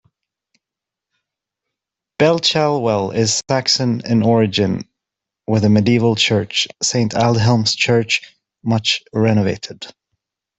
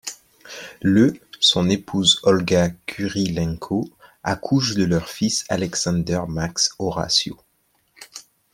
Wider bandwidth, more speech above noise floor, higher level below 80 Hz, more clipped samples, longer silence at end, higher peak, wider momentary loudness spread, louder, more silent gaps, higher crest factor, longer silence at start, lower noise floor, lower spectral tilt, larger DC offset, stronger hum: second, 8.4 kHz vs 16 kHz; first, 69 dB vs 45 dB; second, -54 dBFS vs -48 dBFS; neither; first, 0.7 s vs 0.3 s; about the same, -2 dBFS vs -4 dBFS; second, 10 LU vs 18 LU; first, -16 LUFS vs -20 LUFS; neither; about the same, 16 dB vs 18 dB; first, 2.2 s vs 0.05 s; first, -85 dBFS vs -65 dBFS; about the same, -4.5 dB/octave vs -4 dB/octave; neither; neither